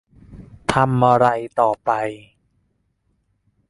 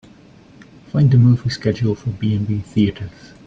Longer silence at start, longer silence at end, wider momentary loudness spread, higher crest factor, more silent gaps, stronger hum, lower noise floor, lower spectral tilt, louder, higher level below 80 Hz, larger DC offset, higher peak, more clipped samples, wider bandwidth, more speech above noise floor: second, 0.3 s vs 0.95 s; first, 1.5 s vs 0.35 s; about the same, 13 LU vs 11 LU; first, 20 dB vs 14 dB; neither; neither; first, -67 dBFS vs -45 dBFS; second, -6.5 dB/octave vs -8 dB/octave; about the same, -19 LUFS vs -18 LUFS; about the same, -50 dBFS vs -46 dBFS; neither; about the same, -2 dBFS vs -4 dBFS; neither; first, 11.5 kHz vs 7.6 kHz; first, 50 dB vs 29 dB